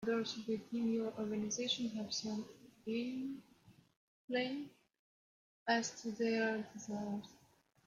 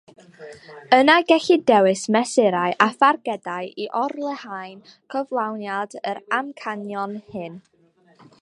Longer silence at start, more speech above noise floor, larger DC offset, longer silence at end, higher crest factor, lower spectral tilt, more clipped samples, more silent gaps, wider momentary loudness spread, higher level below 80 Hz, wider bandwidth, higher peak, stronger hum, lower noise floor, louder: second, 0 s vs 0.4 s; about the same, 32 dB vs 35 dB; neither; second, 0.5 s vs 0.85 s; about the same, 20 dB vs 20 dB; about the same, -3.5 dB/octave vs -4 dB/octave; neither; first, 3.97-4.28 s, 4.99-5.66 s vs none; second, 11 LU vs 18 LU; second, -80 dBFS vs -72 dBFS; second, 10 kHz vs 11.5 kHz; second, -22 dBFS vs 0 dBFS; neither; first, -71 dBFS vs -56 dBFS; second, -40 LUFS vs -20 LUFS